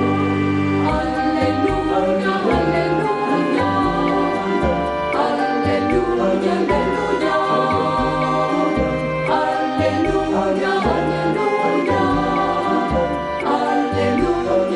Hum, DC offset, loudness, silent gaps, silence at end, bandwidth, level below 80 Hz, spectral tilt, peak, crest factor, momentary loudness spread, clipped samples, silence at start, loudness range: none; under 0.1%; -18 LUFS; none; 0 s; 11 kHz; -36 dBFS; -6.5 dB/octave; -6 dBFS; 12 dB; 2 LU; under 0.1%; 0 s; 1 LU